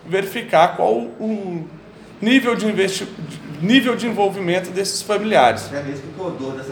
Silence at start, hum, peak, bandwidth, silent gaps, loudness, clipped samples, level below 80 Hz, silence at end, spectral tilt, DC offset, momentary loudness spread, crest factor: 0.05 s; none; 0 dBFS; 19.5 kHz; none; -19 LUFS; under 0.1%; -60 dBFS; 0 s; -4.5 dB/octave; under 0.1%; 14 LU; 20 dB